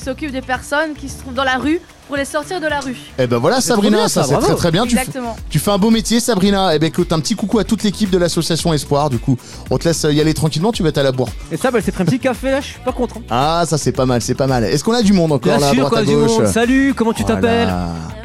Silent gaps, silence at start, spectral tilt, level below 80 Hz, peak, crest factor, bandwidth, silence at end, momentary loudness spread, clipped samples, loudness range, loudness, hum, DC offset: none; 0 s; -5 dB/octave; -34 dBFS; -4 dBFS; 12 dB; 16 kHz; 0 s; 9 LU; under 0.1%; 4 LU; -16 LUFS; none; 1%